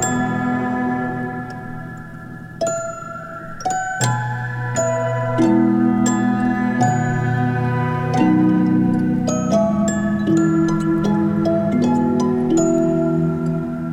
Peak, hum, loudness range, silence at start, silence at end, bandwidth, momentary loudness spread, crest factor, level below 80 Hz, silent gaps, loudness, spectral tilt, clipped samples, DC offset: -4 dBFS; none; 7 LU; 0 s; 0 s; 16 kHz; 13 LU; 14 dB; -48 dBFS; none; -18 LUFS; -6.5 dB/octave; under 0.1%; under 0.1%